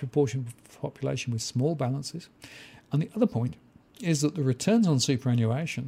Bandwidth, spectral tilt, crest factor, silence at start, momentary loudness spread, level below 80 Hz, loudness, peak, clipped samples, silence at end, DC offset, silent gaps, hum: 15.5 kHz; -6 dB/octave; 16 dB; 0 s; 17 LU; -66 dBFS; -28 LUFS; -12 dBFS; under 0.1%; 0 s; under 0.1%; none; none